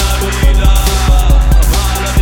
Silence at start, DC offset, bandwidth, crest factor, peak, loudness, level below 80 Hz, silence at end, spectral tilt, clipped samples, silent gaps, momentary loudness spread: 0 s; under 0.1%; 18 kHz; 8 dB; 0 dBFS; -11 LUFS; -10 dBFS; 0 s; -4.5 dB/octave; under 0.1%; none; 3 LU